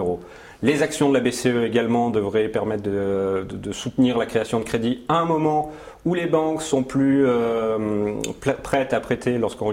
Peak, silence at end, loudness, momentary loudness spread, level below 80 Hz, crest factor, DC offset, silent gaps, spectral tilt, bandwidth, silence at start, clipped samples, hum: -4 dBFS; 0 s; -22 LUFS; 7 LU; -50 dBFS; 18 dB; under 0.1%; none; -5.5 dB/octave; 16 kHz; 0 s; under 0.1%; none